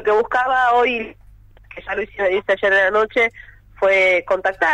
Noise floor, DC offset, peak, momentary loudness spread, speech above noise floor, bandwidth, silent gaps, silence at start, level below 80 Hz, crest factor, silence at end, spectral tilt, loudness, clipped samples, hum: -44 dBFS; under 0.1%; -6 dBFS; 11 LU; 27 dB; 10 kHz; none; 0 s; -48 dBFS; 12 dB; 0 s; -4 dB/octave; -17 LUFS; under 0.1%; none